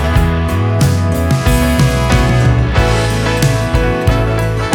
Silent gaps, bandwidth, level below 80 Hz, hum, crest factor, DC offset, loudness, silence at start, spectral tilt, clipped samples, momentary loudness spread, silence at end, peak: none; 19 kHz; -18 dBFS; none; 12 dB; under 0.1%; -13 LUFS; 0 s; -6 dB/octave; under 0.1%; 3 LU; 0 s; 0 dBFS